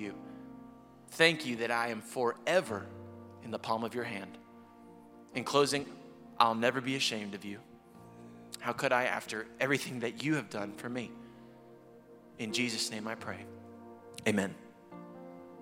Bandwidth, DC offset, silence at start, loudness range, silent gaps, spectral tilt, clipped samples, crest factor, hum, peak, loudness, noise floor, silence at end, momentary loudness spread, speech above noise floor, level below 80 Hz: 16.5 kHz; under 0.1%; 0 s; 5 LU; none; -3.5 dB/octave; under 0.1%; 26 dB; none; -8 dBFS; -33 LUFS; -56 dBFS; 0 s; 23 LU; 23 dB; -76 dBFS